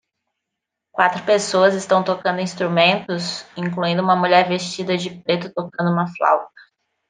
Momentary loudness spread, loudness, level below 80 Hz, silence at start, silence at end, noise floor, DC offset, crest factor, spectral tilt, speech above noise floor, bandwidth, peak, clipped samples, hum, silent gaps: 9 LU; -19 LUFS; -68 dBFS; 0.95 s; 0.6 s; -81 dBFS; under 0.1%; 18 dB; -5 dB/octave; 63 dB; 9.6 kHz; -2 dBFS; under 0.1%; none; none